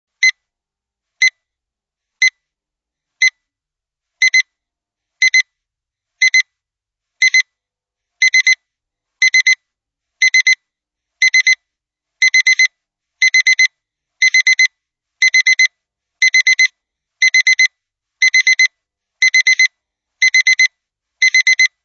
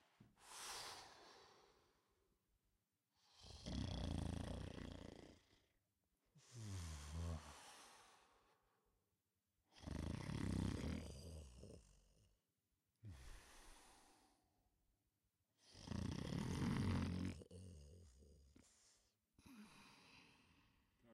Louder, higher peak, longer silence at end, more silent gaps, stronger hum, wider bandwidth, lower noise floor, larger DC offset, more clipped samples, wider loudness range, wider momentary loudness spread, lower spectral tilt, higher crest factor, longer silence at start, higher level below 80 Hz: first, -11 LUFS vs -50 LUFS; first, -2 dBFS vs -30 dBFS; first, 0.15 s vs 0 s; neither; neither; second, 8 kHz vs 15.5 kHz; second, -85 dBFS vs under -90 dBFS; neither; neither; second, 5 LU vs 18 LU; second, 5 LU vs 21 LU; second, 11 dB/octave vs -5.5 dB/octave; second, 14 dB vs 22 dB; about the same, 0.2 s vs 0.2 s; second, -88 dBFS vs -62 dBFS